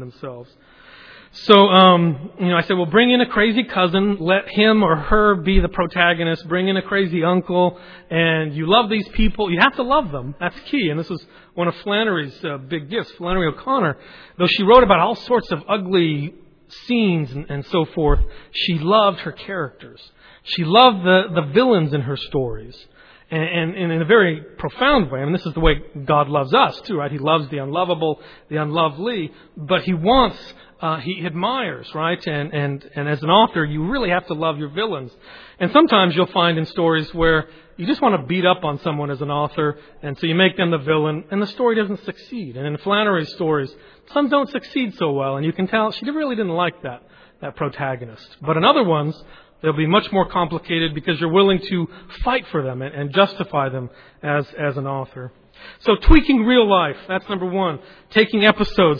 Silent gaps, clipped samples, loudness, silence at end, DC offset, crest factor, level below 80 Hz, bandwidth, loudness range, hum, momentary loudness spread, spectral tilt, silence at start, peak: none; under 0.1%; -18 LUFS; 0 s; under 0.1%; 18 dB; -32 dBFS; 5.4 kHz; 5 LU; none; 13 LU; -8 dB/octave; 0 s; 0 dBFS